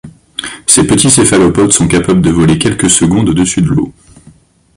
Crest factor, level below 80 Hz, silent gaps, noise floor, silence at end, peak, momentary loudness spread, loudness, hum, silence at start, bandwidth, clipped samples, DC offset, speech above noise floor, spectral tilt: 10 dB; -32 dBFS; none; -42 dBFS; 0.85 s; 0 dBFS; 11 LU; -8 LUFS; none; 0.05 s; 16 kHz; 0.3%; under 0.1%; 34 dB; -4 dB/octave